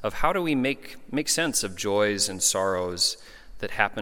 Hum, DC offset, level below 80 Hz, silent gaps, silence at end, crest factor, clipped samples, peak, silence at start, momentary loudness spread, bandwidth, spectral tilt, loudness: none; under 0.1%; -46 dBFS; none; 0 s; 24 dB; under 0.1%; -2 dBFS; 0 s; 11 LU; 17.5 kHz; -2.5 dB/octave; -25 LUFS